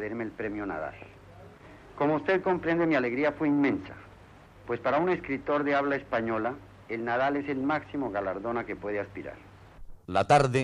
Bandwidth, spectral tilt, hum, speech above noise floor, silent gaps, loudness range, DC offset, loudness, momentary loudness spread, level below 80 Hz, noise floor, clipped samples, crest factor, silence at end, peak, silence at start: 11 kHz; -6.5 dB/octave; none; 24 dB; none; 4 LU; under 0.1%; -29 LUFS; 16 LU; -56 dBFS; -52 dBFS; under 0.1%; 18 dB; 0 s; -10 dBFS; 0 s